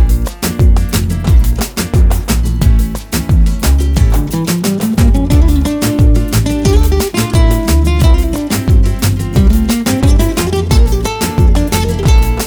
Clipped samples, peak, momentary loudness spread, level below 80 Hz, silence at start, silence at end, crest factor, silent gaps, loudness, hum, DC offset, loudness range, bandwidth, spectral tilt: under 0.1%; 0 dBFS; 4 LU; -12 dBFS; 0 s; 0 s; 10 dB; none; -12 LUFS; none; under 0.1%; 1 LU; over 20 kHz; -6 dB/octave